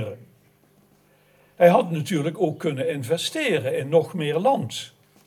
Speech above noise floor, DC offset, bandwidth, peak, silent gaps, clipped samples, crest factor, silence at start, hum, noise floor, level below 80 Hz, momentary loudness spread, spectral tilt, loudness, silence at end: 37 dB; under 0.1%; 14.5 kHz; -4 dBFS; none; under 0.1%; 20 dB; 0 s; 50 Hz at -50 dBFS; -59 dBFS; -74 dBFS; 15 LU; -5.5 dB/octave; -22 LUFS; 0.4 s